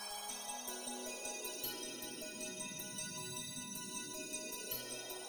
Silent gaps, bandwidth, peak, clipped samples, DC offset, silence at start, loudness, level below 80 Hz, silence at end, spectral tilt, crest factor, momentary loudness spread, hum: none; over 20 kHz; -28 dBFS; under 0.1%; under 0.1%; 0 s; -43 LUFS; -74 dBFS; 0 s; -1.5 dB/octave; 18 dB; 2 LU; none